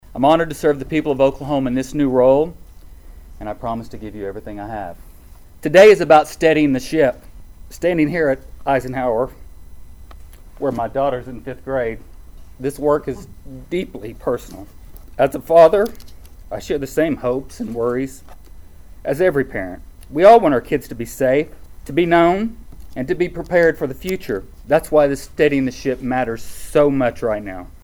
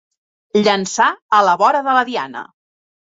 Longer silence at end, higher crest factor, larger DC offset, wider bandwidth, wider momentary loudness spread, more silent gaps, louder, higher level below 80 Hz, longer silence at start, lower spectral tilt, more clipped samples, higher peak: second, 0.15 s vs 0.7 s; about the same, 18 dB vs 16 dB; neither; first, over 20 kHz vs 8 kHz; first, 18 LU vs 11 LU; second, none vs 1.22-1.29 s; about the same, -17 LUFS vs -15 LUFS; first, -40 dBFS vs -66 dBFS; second, 0.1 s vs 0.55 s; first, -6 dB/octave vs -3.5 dB/octave; neither; about the same, 0 dBFS vs -2 dBFS